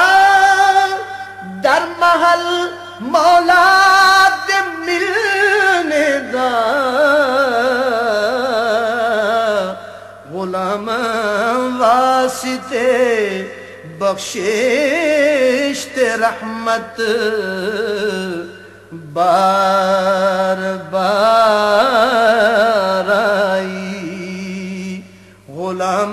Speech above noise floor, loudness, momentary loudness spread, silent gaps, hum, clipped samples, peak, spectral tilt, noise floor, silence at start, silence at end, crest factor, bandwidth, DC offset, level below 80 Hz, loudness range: 25 dB; -14 LUFS; 15 LU; none; none; under 0.1%; -2 dBFS; -3.5 dB/octave; -40 dBFS; 0 s; 0 s; 14 dB; 14 kHz; under 0.1%; -58 dBFS; 6 LU